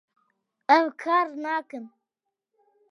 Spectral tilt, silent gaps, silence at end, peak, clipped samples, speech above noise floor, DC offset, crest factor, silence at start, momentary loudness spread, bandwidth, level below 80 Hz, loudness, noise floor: -3.5 dB/octave; none; 1.05 s; -4 dBFS; under 0.1%; 61 dB; under 0.1%; 24 dB; 0.7 s; 18 LU; 11 kHz; under -90 dBFS; -24 LUFS; -85 dBFS